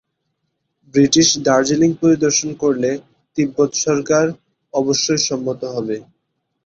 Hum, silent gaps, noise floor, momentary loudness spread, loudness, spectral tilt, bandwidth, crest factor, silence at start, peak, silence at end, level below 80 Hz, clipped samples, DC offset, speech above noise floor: none; none; -72 dBFS; 11 LU; -17 LUFS; -3.5 dB/octave; 8 kHz; 16 dB; 0.95 s; -2 dBFS; 0.65 s; -56 dBFS; under 0.1%; under 0.1%; 56 dB